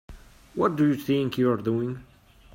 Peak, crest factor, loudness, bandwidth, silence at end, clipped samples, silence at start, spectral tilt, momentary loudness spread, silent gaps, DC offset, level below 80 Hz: -10 dBFS; 16 dB; -25 LUFS; 16 kHz; 0.5 s; under 0.1%; 0.1 s; -7.5 dB/octave; 12 LU; none; under 0.1%; -54 dBFS